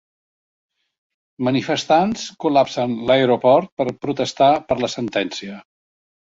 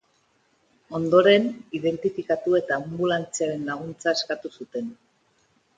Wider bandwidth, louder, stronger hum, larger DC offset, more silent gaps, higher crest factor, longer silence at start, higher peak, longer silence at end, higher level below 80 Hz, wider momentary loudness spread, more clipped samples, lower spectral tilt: second, 7.8 kHz vs 9.4 kHz; first, -19 LUFS vs -24 LUFS; neither; neither; first, 3.72-3.77 s vs none; about the same, 18 dB vs 22 dB; first, 1.4 s vs 0.9 s; about the same, -2 dBFS vs -4 dBFS; second, 0.6 s vs 0.85 s; first, -58 dBFS vs -66 dBFS; second, 9 LU vs 15 LU; neither; about the same, -5 dB/octave vs -4.5 dB/octave